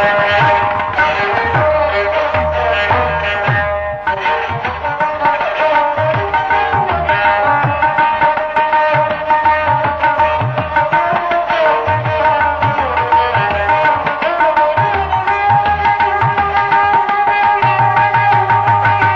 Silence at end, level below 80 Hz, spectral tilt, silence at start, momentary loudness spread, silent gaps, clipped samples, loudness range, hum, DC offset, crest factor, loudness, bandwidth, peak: 0 s; -34 dBFS; -6.5 dB/octave; 0 s; 4 LU; none; under 0.1%; 3 LU; none; under 0.1%; 10 dB; -13 LUFS; 7 kHz; -2 dBFS